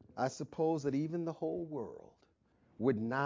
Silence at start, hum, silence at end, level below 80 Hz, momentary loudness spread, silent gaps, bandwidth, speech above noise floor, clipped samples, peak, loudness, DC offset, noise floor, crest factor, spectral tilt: 0.15 s; none; 0 s; -72 dBFS; 10 LU; none; 7.6 kHz; 35 dB; under 0.1%; -18 dBFS; -37 LUFS; under 0.1%; -71 dBFS; 18 dB; -7 dB/octave